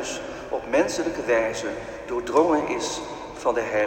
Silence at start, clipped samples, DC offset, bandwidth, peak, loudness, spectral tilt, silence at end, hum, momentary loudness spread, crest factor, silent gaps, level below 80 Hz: 0 s; under 0.1%; under 0.1%; 16 kHz; -6 dBFS; -25 LUFS; -3.5 dB/octave; 0 s; none; 11 LU; 18 dB; none; -52 dBFS